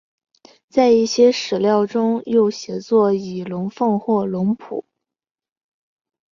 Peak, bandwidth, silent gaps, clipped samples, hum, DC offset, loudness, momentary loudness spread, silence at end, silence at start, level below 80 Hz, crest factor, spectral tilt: -2 dBFS; 7.4 kHz; none; under 0.1%; none; under 0.1%; -18 LUFS; 12 LU; 1.5 s; 0.75 s; -62 dBFS; 16 dB; -6 dB/octave